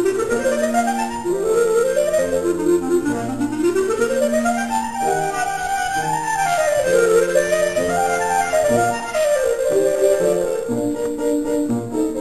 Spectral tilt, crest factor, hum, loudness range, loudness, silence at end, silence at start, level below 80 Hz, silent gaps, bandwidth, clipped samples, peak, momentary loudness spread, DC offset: -4.5 dB/octave; 14 dB; none; 2 LU; -19 LUFS; 0 s; 0 s; -48 dBFS; none; 14 kHz; under 0.1%; -4 dBFS; 5 LU; 0.7%